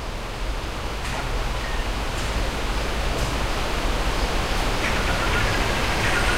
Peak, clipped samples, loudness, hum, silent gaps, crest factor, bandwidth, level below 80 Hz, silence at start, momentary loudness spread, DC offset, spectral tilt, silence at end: -8 dBFS; under 0.1%; -25 LUFS; none; none; 16 dB; 16 kHz; -26 dBFS; 0 s; 8 LU; 1%; -4 dB/octave; 0 s